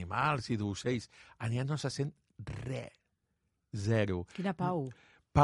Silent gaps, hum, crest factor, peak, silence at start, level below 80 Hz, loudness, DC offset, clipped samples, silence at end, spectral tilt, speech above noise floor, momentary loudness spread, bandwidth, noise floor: none; none; 24 dB; -10 dBFS; 0 s; -56 dBFS; -36 LUFS; under 0.1%; under 0.1%; 0 s; -6.5 dB/octave; 46 dB; 13 LU; 11.5 kHz; -81 dBFS